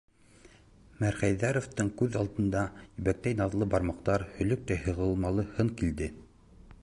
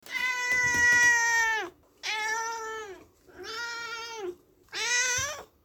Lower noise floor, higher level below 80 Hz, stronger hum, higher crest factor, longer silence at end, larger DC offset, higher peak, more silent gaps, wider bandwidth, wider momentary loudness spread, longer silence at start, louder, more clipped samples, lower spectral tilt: first, -57 dBFS vs -50 dBFS; first, -46 dBFS vs -60 dBFS; neither; about the same, 18 dB vs 16 dB; about the same, 0.1 s vs 0.2 s; neither; about the same, -12 dBFS vs -14 dBFS; neither; second, 11.5 kHz vs 19 kHz; second, 4 LU vs 19 LU; first, 0.45 s vs 0.05 s; second, -31 LUFS vs -25 LUFS; neither; first, -7 dB/octave vs 0 dB/octave